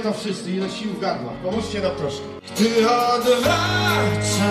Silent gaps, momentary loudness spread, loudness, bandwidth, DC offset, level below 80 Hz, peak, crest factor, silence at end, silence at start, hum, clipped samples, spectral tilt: none; 9 LU; -21 LUFS; 15.5 kHz; under 0.1%; -48 dBFS; -6 dBFS; 14 dB; 0 s; 0 s; none; under 0.1%; -4.5 dB/octave